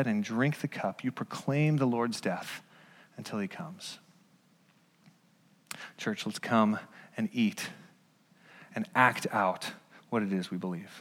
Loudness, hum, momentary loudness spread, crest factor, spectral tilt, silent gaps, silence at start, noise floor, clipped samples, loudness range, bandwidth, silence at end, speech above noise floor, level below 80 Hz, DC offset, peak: -32 LUFS; none; 17 LU; 24 dB; -5.5 dB/octave; none; 0 s; -66 dBFS; under 0.1%; 11 LU; 16.5 kHz; 0 s; 35 dB; -84 dBFS; under 0.1%; -8 dBFS